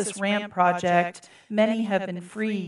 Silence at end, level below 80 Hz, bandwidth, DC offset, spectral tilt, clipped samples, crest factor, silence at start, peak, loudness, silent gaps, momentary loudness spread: 0 s; -74 dBFS; 11.5 kHz; under 0.1%; -5 dB/octave; under 0.1%; 18 dB; 0 s; -6 dBFS; -25 LUFS; none; 8 LU